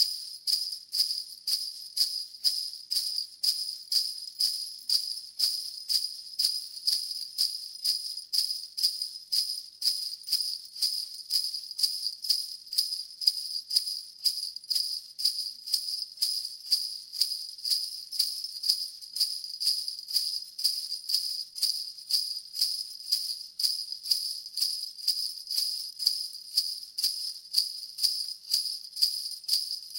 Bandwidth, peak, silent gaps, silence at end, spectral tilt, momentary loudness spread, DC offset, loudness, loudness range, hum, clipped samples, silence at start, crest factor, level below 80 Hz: 17 kHz; -6 dBFS; none; 0 s; 5.5 dB/octave; 5 LU; under 0.1%; -28 LUFS; 1 LU; none; under 0.1%; 0 s; 26 dB; -86 dBFS